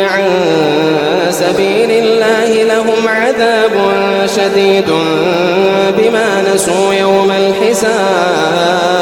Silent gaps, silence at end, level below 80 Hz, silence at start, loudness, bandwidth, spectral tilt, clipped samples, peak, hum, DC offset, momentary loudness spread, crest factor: none; 0 s; -50 dBFS; 0 s; -10 LUFS; 17 kHz; -4 dB/octave; under 0.1%; 0 dBFS; none; 0.1%; 2 LU; 10 dB